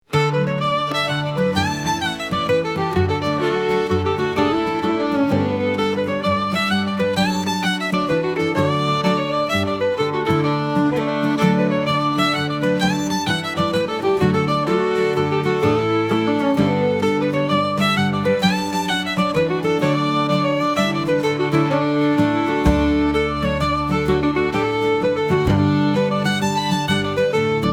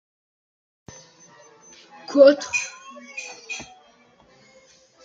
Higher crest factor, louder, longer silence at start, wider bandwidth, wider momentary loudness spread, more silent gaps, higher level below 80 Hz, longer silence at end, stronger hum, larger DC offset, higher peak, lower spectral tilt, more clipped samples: second, 16 dB vs 22 dB; about the same, -19 LUFS vs -20 LUFS; second, 0.1 s vs 2.1 s; first, 17 kHz vs 7.8 kHz; second, 3 LU vs 27 LU; neither; first, -40 dBFS vs -70 dBFS; second, 0 s vs 1.4 s; neither; neither; about the same, -2 dBFS vs -2 dBFS; first, -6 dB/octave vs -2.5 dB/octave; neither